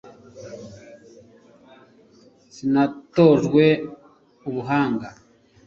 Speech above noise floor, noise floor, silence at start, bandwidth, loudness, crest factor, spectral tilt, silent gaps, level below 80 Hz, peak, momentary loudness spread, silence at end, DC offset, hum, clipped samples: 35 dB; -53 dBFS; 0.35 s; 7.4 kHz; -20 LUFS; 20 dB; -7.5 dB/octave; none; -60 dBFS; -2 dBFS; 24 LU; 0.55 s; under 0.1%; none; under 0.1%